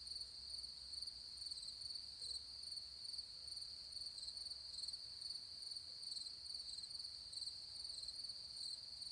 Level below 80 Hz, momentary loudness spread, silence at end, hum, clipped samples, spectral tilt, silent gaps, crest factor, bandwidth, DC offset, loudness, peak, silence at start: -74 dBFS; 2 LU; 0 s; none; under 0.1%; 0.5 dB/octave; none; 16 dB; 10.5 kHz; under 0.1%; -48 LUFS; -36 dBFS; 0 s